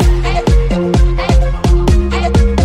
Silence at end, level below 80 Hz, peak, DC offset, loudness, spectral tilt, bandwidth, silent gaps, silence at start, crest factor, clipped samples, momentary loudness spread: 0 s; -12 dBFS; 0 dBFS; under 0.1%; -13 LUFS; -6.5 dB/octave; 10.5 kHz; none; 0 s; 10 dB; under 0.1%; 1 LU